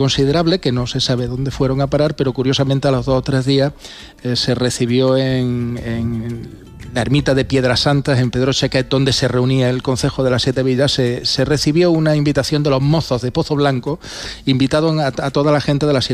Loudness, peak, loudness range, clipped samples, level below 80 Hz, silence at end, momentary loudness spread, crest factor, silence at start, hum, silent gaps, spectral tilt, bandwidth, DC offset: -16 LUFS; -4 dBFS; 2 LU; under 0.1%; -38 dBFS; 0 s; 7 LU; 12 dB; 0 s; none; none; -5.5 dB/octave; 13.5 kHz; under 0.1%